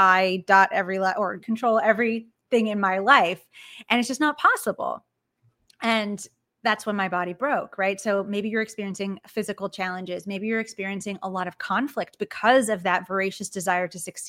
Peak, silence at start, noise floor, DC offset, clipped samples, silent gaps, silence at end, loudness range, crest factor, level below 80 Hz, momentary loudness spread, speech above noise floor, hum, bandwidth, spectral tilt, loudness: -2 dBFS; 0 s; -68 dBFS; under 0.1%; under 0.1%; none; 0 s; 7 LU; 22 dB; -74 dBFS; 13 LU; 44 dB; none; 16.5 kHz; -4 dB/octave; -24 LUFS